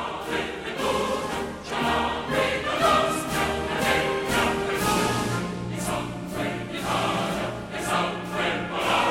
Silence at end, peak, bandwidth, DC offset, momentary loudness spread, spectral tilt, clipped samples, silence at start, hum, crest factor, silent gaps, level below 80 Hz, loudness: 0 s; -8 dBFS; 16.5 kHz; under 0.1%; 8 LU; -4 dB/octave; under 0.1%; 0 s; none; 18 dB; none; -46 dBFS; -25 LUFS